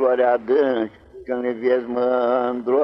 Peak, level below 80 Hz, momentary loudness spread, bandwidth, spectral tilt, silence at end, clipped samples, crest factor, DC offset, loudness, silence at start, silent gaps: -8 dBFS; -60 dBFS; 9 LU; 5.8 kHz; -8 dB/octave; 0 s; under 0.1%; 12 dB; under 0.1%; -21 LUFS; 0 s; none